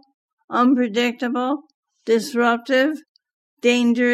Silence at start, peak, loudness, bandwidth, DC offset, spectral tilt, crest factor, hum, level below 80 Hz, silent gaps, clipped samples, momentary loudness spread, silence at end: 0.5 s; -6 dBFS; -20 LUFS; 13.5 kHz; under 0.1%; -4 dB/octave; 14 dB; none; -80 dBFS; 1.74-1.83 s, 3.09-3.15 s, 3.33-3.57 s; under 0.1%; 8 LU; 0 s